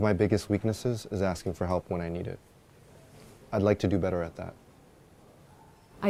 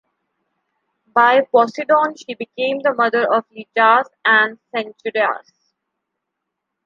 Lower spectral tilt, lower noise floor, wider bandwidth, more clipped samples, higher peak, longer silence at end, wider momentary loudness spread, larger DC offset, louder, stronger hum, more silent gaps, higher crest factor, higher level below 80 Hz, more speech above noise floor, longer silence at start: first, -7 dB/octave vs -4 dB/octave; second, -56 dBFS vs -79 dBFS; first, 15 kHz vs 7.4 kHz; neither; second, -10 dBFS vs -2 dBFS; second, 0 s vs 1.45 s; about the same, 13 LU vs 12 LU; neither; second, -30 LUFS vs -17 LUFS; neither; neither; about the same, 22 dB vs 18 dB; first, -52 dBFS vs -76 dBFS; second, 28 dB vs 62 dB; second, 0 s vs 1.15 s